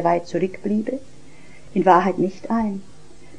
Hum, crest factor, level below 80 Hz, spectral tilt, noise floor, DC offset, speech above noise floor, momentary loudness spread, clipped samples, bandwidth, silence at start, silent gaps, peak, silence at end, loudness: none; 22 dB; -54 dBFS; -7.5 dB/octave; -47 dBFS; 1%; 27 dB; 13 LU; under 0.1%; 10 kHz; 0 s; none; 0 dBFS; 0.55 s; -21 LUFS